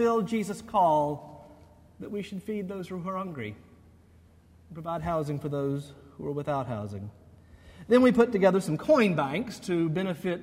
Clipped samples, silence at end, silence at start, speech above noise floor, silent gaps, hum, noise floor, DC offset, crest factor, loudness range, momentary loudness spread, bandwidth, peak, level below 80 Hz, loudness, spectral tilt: under 0.1%; 0 s; 0 s; 30 dB; none; none; -57 dBFS; under 0.1%; 20 dB; 12 LU; 17 LU; 16 kHz; -8 dBFS; -58 dBFS; -28 LUFS; -7 dB/octave